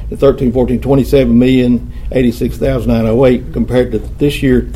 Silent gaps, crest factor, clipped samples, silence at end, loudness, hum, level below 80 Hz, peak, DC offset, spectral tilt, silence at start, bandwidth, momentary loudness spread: none; 12 dB; under 0.1%; 0 s; -12 LUFS; none; -24 dBFS; 0 dBFS; under 0.1%; -8 dB/octave; 0 s; 15 kHz; 6 LU